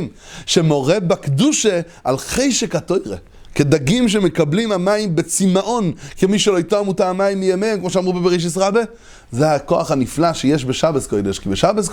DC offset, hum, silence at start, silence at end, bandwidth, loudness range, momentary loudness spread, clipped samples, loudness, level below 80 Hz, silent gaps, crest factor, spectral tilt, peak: under 0.1%; none; 0 s; 0 s; 19 kHz; 1 LU; 7 LU; under 0.1%; -17 LUFS; -42 dBFS; none; 16 dB; -5 dB/octave; 0 dBFS